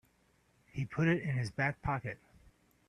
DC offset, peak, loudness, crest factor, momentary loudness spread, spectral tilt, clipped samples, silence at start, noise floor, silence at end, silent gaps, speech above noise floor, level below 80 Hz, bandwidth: under 0.1%; -18 dBFS; -35 LUFS; 20 dB; 14 LU; -7.5 dB/octave; under 0.1%; 0.75 s; -71 dBFS; 0.75 s; none; 37 dB; -60 dBFS; 10.5 kHz